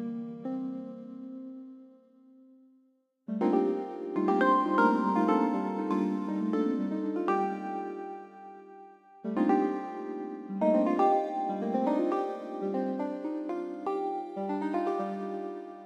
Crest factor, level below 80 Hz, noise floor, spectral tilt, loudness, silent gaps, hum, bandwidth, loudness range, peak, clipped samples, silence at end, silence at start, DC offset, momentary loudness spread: 18 dB; -86 dBFS; -69 dBFS; -8 dB/octave; -30 LUFS; none; none; 7.8 kHz; 7 LU; -12 dBFS; under 0.1%; 0 s; 0 s; under 0.1%; 18 LU